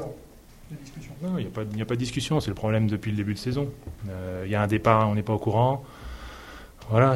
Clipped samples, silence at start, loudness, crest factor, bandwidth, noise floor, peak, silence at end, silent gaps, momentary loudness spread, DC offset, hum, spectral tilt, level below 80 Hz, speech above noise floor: under 0.1%; 0 s; -26 LUFS; 24 dB; 15.5 kHz; -48 dBFS; -4 dBFS; 0 s; none; 20 LU; under 0.1%; none; -7 dB/octave; -48 dBFS; 23 dB